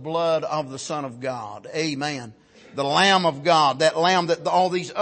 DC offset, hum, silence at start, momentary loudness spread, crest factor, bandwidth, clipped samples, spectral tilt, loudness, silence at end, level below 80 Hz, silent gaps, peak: under 0.1%; none; 0 s; 13 LU; 16 dB; 8.8 kHz; under 0.1%; -4 dB/octave; -22 LUFS; 0 s; -68 dBFS; none; -6 dBFS